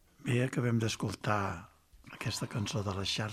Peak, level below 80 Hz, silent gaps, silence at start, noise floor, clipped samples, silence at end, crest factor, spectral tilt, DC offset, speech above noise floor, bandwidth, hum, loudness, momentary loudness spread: -16 dBFS; -64 dBFS; none; 0.2 s; -54 dBFS; under 0.1%; 0 s; 18 dB; -5 dB/octave; under 0.1%; 21 dB; 14.5 kHz; none; -34 LUFS; 8 LU